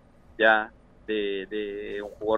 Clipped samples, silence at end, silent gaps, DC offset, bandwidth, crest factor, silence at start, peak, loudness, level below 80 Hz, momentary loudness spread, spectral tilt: under 0.1%; 0 s; none; under 0.1%; 6.8 kHz; 22 dB; 0.4 s; -6 dBFS; -26 LUFS; -56 dBFS; 15 LU; -5.5 dB/octave